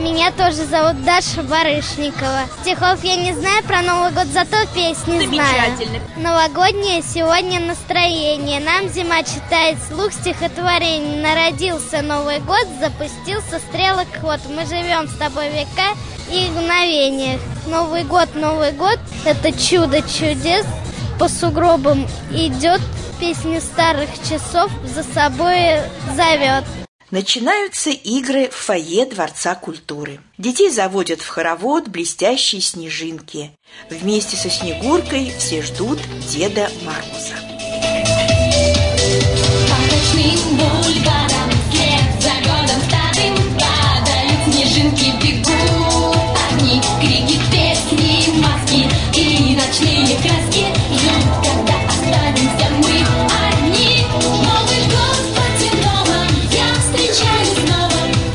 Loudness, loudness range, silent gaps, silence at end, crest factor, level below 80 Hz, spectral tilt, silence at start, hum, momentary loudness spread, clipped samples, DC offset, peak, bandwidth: -15 LUFS; 6 LU; 26.88-26.99 s; 0 s; 14 dB; -32 dBFS; -4 dB/octave; 0 s; none; 9 LU; under 0.1%; under 0.1%; -2 dBFS; 11 kHz